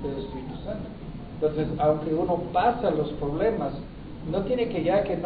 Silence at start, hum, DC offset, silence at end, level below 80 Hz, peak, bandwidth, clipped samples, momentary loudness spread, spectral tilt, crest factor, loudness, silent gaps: 0 s; none; under 0.1%; 0 s; -44 dBFS; -10 dBFS; 4.9 kHz; under 0.1%; 15 LU; -11.5 dB/octave; 16 dB; -27 LUFS; none